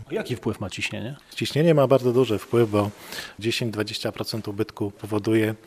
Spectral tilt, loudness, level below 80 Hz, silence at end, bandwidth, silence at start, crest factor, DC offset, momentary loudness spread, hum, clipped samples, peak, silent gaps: -6 dB/octave; -24 LUFS; -62 dBFS; 0.1 s; 14.5 kHz; 0 s; 20 dB; under 0.1%; 11 LU; none; under 0.1%; -4 dBFS; none